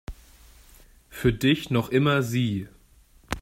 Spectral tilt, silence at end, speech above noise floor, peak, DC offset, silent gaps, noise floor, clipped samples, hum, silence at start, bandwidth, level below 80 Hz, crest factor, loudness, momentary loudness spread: -6 dB/octave; 0 s; 33 dB; -8 dBFS; under 0.1%; none; -56 dBFS; under 0.1%; none; 0.1 s; 16 kHz; -46 dBFS; 20 dB; -24 LUFS; 22 LU